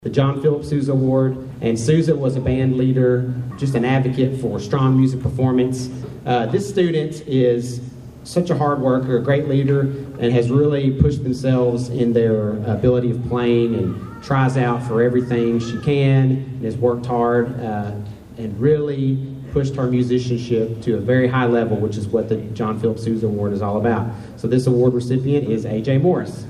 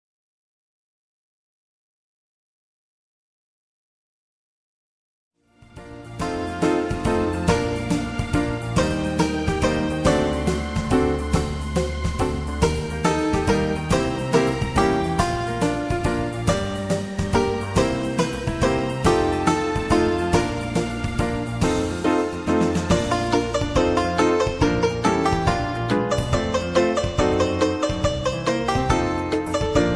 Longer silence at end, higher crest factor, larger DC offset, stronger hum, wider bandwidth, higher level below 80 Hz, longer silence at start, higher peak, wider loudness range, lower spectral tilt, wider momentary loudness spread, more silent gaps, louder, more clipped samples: about the same, 0 s vs 0 s; about the same, 18 dB vs 18 dB; second, under 0.1% vs 0.1%; neither; about the same, 11 kHz vs 11 kHz; second, -42 dBFS vs -34 dBFS; second, 0 s vs 5.6 s; first, 0 dBFS vs -4 dBFS; about the same, 3 LU vs 3 LU; first, -8 dB/octave vs -5.5 dB/octave; about the same, 7 LU vs 5 LU; neither; first, -19 LUFS vs -22 LUFS; neither